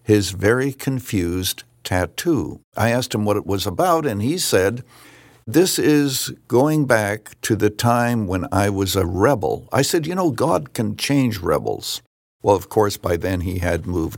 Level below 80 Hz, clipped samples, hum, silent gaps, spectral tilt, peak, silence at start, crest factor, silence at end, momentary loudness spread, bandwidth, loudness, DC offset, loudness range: -50 dBFS; under 0.1%; none; 2.64-2.72 s, 12.07-12.40 s; -5 dB/octave; -2 dBFS; 0.1 s; 18 dB; 0 s; 7 LU; 17 kHz; -20 LUFS; under 0.1%; 2 LU